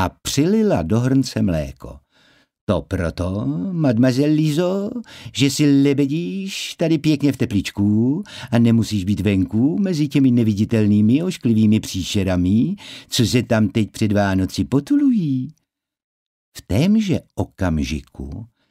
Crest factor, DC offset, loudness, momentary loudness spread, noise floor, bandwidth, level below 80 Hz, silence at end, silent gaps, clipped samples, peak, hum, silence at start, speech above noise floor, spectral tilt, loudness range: 14 dB; under 0.1%; -19 LUFS; 10 LU; -57 dBFS; 16 kHz; -42 dBFS; 0.25 s; 2.61-2.67 s, 16.04-16.52 s; under 0.1%; -4 dBFS; none; 0 s; 38 dB; -6.5 dB/octave; 4 LU